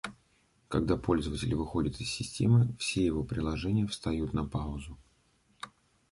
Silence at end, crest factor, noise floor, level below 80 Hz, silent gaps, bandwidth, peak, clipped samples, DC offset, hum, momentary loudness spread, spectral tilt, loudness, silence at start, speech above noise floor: 0.45 s; 20 dB; -69 dBFS; -46 dBFS; none; 11.5 kHz; -12 dBFS; under 0.1%; under 0.1%; none; 18 LU; -6 dB/octave; -31 LUFS; 0.05 s; 39 dB